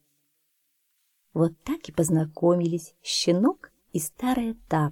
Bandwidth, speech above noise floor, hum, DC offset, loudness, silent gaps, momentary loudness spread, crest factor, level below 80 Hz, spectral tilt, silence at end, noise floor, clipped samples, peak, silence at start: 17 kHz; 48 dB; none; under 0.1%; -26 LUFS; none; 10 LU; 16 dB; -56 dBFS; -5.5 dB/octave; 0 s; -73 dBFS; under 0.1%; -10 dBFS; 1.35 s